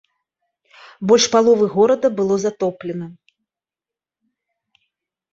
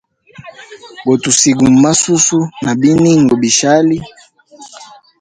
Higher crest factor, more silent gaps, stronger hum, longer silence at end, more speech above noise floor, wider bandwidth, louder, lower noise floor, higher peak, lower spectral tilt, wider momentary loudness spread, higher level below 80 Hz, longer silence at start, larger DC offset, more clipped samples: first, 18 dB vs 12 dB; neither; neither; first, 2.2 s vs 0.35 s; first, 73 dB vs 28 dB; second, 8 kHz vs 10.5 kHz; second, -17 LUFS vs -10 LUFS; first, -89 dBFS vs -39 dBFS; about the same, -2 dBFS vs 0 dBFS; about the same, -4 dB/octave vs -4 dB/octave; first, 15 LU vs 7 LU; second, -64 dBFS vs -46 dBFS; first, 1 s vs 0.4 s; neither; neither